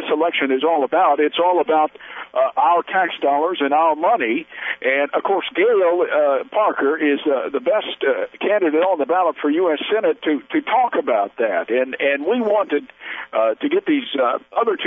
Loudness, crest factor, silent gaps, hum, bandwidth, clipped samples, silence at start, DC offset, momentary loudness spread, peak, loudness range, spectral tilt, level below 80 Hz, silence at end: -19 LUFS; 14 dB; none; none; 3.9 kHz; under 0.1%; 0 s; under 0.1%; 5 LU; -4 dBFS; 2 LU; -7 dB/octave; -72 dBFS; 0 s